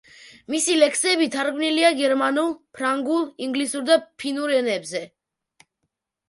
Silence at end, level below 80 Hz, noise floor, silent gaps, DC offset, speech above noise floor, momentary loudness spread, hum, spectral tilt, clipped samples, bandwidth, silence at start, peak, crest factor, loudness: 1.2 s; -74 dBFS; -78 dBFS; none; under 0.1%; 57 dB; 9 LU; none; -1.5 dB/octave; under 0.1%; 11.5 kHz; 0.25 s; -4 dBFS; 20 dB; -21 LUFS